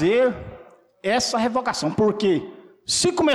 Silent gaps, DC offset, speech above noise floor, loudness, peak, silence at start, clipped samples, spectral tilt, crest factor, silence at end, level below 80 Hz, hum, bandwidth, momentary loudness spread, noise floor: none; under 0.1%; 25 dB; -22 LUFS; -12 dBFS; 0 s; under 0.1%; -3.5 dB/octave; 10 dB; 0 s; -52 dBFS; none; 14 kHz; 16 LU; -46 dBFS